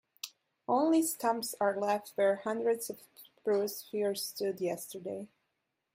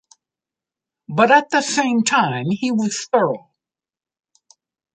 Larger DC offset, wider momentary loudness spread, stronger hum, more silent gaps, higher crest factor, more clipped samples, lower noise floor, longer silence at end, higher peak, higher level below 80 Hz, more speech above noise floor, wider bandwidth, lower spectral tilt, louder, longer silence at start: neither; first, 17 LU vs 8 LU; neither; neither; about the same, 16 dB vs 18 dB; neither; second, -83 dBFS vs under -90 dBFS; second, 0.7 s vs 1.55 s; second, -16 dBFS vs -2 dBFS; second, -84 dBFS vs -68 dBFS; second, 51 dB vs over 73 dB; first, 16 kHz vs 9.6 kHz; about the same, -4 dB/octave vs -4 dB/octave; second, -33 LUFS vs -18 LUFS; second, 0.25 s vs 1.1 s